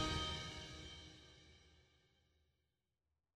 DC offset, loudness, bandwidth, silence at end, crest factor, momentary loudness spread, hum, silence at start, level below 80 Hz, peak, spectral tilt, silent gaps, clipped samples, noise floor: under 0.1%; -46 LUFS; 14.5 kHz; 1.55 s; 22 dB; 23 LU; none; 0 s; -60 dBFS; -28 dBFS; -3.5 dB/octave; none; under 0.1%; under -90 dBFS